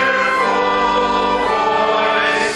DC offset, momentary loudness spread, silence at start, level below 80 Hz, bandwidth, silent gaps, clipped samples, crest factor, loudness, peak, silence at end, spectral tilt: under 0.1%; 1 LU; 0 s; -44 dBFS; 12 kHz; none; under 0.1%; 12 dB; -15 LUFS; -2 dBFS; 0 s; -3 dB/octave